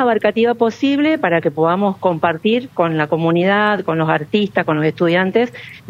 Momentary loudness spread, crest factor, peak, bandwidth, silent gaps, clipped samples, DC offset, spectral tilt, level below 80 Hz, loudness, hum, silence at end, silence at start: 3 LU; 16 dB; 0 dBFS; 8.2 kHz; none; under 0.1%; under 0.1%; -7.5 dB/octave; -60 dBFS; -16 LUFS; none; 0 s; 0 s